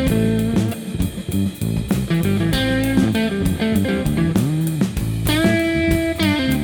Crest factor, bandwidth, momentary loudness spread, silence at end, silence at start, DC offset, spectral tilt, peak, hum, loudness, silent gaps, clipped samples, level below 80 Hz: 16 dB; over 20 kHz; 5 LU; 0 s; 0 s; under 0.1%; -6 dB/octave; -2 dBFS; none; -19 LUFS; none; under 0.1%; -32 dBFS